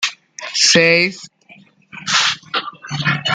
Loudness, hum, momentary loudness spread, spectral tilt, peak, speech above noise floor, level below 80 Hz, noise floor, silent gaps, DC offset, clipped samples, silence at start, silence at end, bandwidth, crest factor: -15 LUFS; none; 18 LU; -2 dB/octave; 0 dBFS; 32 dB; -62 dBFS; -47 dBFS; none; under 0.1%; under 0.1%; 0 s; 0 s; 11 kHz; 18 dB